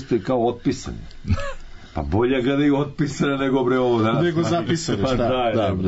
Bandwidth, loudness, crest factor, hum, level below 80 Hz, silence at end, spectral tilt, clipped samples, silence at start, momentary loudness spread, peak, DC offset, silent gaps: 8 kHz; -21 LUFS; 12 dB; none; -38 dBFS; 0 s; -6.5 dB/octave; under 0.1%; 0 s; 12 LU; -10 dBFS; under 0.1%; none